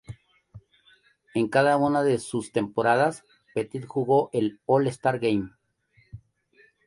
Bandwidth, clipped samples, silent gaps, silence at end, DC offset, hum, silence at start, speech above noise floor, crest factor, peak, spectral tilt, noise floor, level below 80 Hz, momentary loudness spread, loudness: 11.5 kHz; under 0.1%; none; 0.7 s; under 0.1%; none; 0.1 s; 40 dB; 18 dB; -8 dBFS; -6 dB/octave; -64 dBFS; -62 dBFS; 11 LU; -25 LUFS